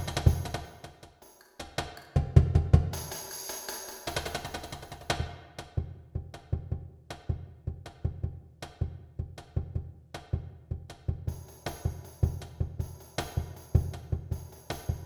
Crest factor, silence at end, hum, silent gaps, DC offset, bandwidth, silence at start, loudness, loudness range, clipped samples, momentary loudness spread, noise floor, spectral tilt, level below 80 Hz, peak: 28 dB; 0 s; none; none; under 0.1%; over 20 kHz; 0 s; -34 LUFS; 9 LU; under 0.1%; 16 LU; -57 dBFS; -5.5 dB/octave; -38 dBFS; -6 dBFS